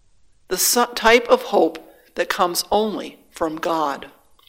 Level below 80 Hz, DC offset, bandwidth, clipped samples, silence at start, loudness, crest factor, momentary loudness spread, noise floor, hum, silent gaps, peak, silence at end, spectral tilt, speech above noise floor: -50 dBFS; under 0.1%; 16.5 kHz; under 0.1%; 0.5 s; -19 LUFS; 20 dB; 17 LU; -57 dBFS; none; none; 0 dBFS; 0.4 s; -2 dB/octave; 37 dB